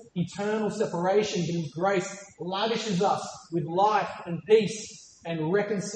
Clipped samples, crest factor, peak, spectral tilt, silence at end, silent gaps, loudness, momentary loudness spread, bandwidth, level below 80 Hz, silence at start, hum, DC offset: under 0.1%; 18 dB; -8 dBFS; -5 dB/octave; 0 s; none; -27 LUFS; 13 LU; 9.2 kHz; -70 dBFS; 0 s; none; under 0.1%